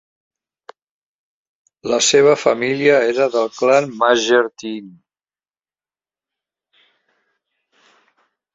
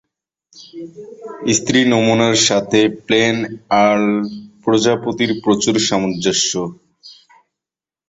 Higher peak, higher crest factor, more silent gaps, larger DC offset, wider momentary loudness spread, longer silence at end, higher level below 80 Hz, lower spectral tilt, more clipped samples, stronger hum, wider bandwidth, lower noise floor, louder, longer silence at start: about the same, -2 dBFS vs 0 dBFS; about the same, 18 dB vs 16 dB; neither; neither; second, 16 LU vs 19 LU; first, 3.65 s vs 0.95 s; second, -64 dBFS vs -54 dBFS; about the same, -3 dB/octave vs -3.5 dB/octave; neither; neither; about the same, 8 kHz vs 8 kHz; about the same, under -90 dBFS vs -88 dBFS; about the same, -15 LUFS vs -15 LUFS; first, 1.85 s vs 0.55 s